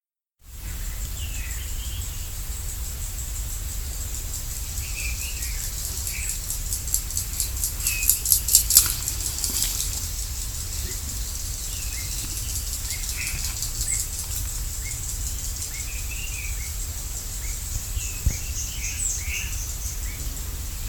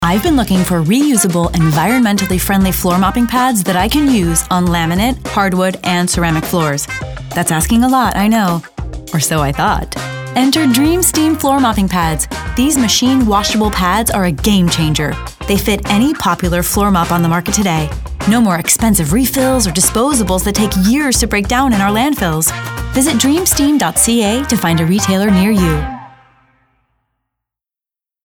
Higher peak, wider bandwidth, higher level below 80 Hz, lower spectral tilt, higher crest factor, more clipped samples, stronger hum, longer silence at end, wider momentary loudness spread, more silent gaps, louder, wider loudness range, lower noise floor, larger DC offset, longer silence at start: about the same, 0 dBFS vs 0 dBFS; about the same, 19.5 kHz vs over 20 kHz; about the same, -32 dBFS vs -28 dBFS; second, -1 dB/octave vs -4 dB/octave; first, 28 dB vs 12 dB; neither; neither; second, 0 s vs 2.2 s; first, 10 LU vs 6 LU; neither; second, -26 LUFS vs -13 LUFS; first, 11 LU vs 2 LU; second, -53 dBFS vs -87 dBFS; first, 0.1% vs under 0.1%; first, 0.45 s vs 0 s